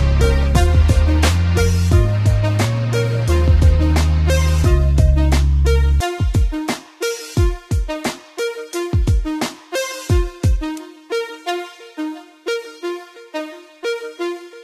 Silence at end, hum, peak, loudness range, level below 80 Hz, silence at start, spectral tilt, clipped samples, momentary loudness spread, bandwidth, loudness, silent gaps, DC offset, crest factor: 0 s; none; -2 dBFS; 10 LU; -20 dBFS; 0 s; -6 dB/octave; under 0.1%; 13 LU; 14 kHz; -18 LUFS; none; under 0.1%; 14 dB